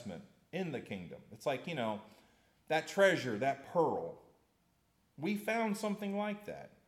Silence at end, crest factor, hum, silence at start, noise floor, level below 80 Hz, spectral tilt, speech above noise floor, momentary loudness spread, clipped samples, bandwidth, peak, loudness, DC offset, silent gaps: 0.2 s; 22 dB; none; 0 s; -75 dBFS; -78 dBFS; -5 dB/octave; 39 dB; 16 LU; under 0.1%; 15.5 kHz; -16 dBFS; -36 LUFS; under 0.1%; none